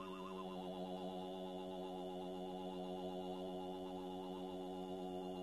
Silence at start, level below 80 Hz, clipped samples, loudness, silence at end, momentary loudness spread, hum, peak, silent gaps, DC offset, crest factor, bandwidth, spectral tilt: 0 s; -74 dBFS; under 0.1%; -48 LUFS; 0 s; 1 LU; none; -36 dBFS; none; under 0.1%; 12 dB; 13 kHz; -6.5 dB/octave